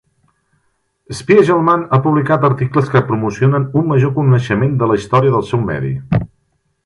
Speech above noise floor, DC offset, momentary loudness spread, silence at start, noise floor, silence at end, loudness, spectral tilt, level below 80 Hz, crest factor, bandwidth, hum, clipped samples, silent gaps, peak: 51 dB; under 0.1%; 7 LU; 1.1 s; -64 dBFS; 0.6 s; -14 LUFS; -8 dB/octave; -44 dBFS; 14 dB; 11 kHz; none; under 0.1%; none; 0 dBFS